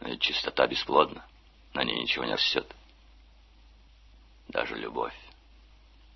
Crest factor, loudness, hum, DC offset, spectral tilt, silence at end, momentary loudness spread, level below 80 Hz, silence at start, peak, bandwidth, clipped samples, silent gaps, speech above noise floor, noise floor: 26 dB; -28 LUFS; none; under 0.1%; -3.5 dB/octave; 0.85 s; 13 LU; -56 dBFS; 0 s; -6 dBFS; 6.2 kHz; under 0.1%; none; 27 dB; -56 dBFS